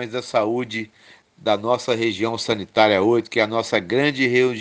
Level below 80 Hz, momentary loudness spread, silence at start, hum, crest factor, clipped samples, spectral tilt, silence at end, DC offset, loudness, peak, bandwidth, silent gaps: -66 dBFS; 8 LU; 0 s; none; 20 dB; under 0.1%; -5 dB/octave; 0 s; under 0.1%; -20 LUFS; 0 dBFS; 9.6 kHz; none